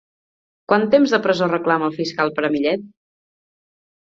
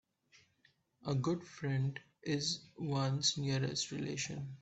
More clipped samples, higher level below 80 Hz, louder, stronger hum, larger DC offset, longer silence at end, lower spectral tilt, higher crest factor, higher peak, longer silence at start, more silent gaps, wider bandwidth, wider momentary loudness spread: neither; first, -64 dBFS vs -72 dBFS; first, -19 LUFS vs -37 LUFS; neither; neither; first, 1.25 s vs 0.05 s; first, -6 dB/octave vs -4.5 dB/octave; about the same, 18 dB vs 18 dB; first, -2 dBFS vs -20 dBFS; second, 0.7 s vs 1.05 s; neither; about the same, 7.8 kHz vs 8.4 kHz; about the same, 7 LU vs 8 LU